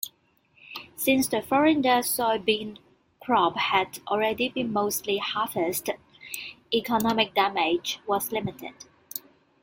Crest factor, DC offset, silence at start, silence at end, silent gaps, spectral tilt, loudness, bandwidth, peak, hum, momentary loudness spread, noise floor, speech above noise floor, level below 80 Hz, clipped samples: 20 dB; under 0.1%; 0.05 s; 0.45 s; none; -3 dB/octave; -25 LUFS; 17 kHz; -6 dBFS; none; 15 LU; -64 dBFS; 39 dB; -64 dBFS; under 0.1%